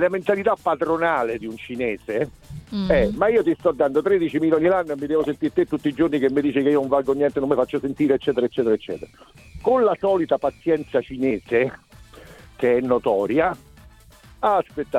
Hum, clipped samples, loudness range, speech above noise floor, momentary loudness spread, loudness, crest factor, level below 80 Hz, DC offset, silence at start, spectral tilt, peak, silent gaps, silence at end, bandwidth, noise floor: none; under 0.1%; 3 LU; 27 dB; 8 LU; -21 LUFS; 16 dB; -46 dBFS; under 0.1%; 0 s; -7.5 dB/octave; -4 dBFS; none; 0 s; 13.5 kHz; -48 dBFS